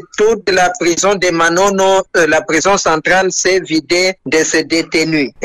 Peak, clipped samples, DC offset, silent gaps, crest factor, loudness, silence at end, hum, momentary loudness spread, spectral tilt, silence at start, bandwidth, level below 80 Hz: -4 dBFS; under 0.1%; under 0.1%; none; 10 dB; -12 LUFS; 0 s; none; 3 LU; -3 dB/octave; 0.2 s; 13.5 kHz; -44 dBFS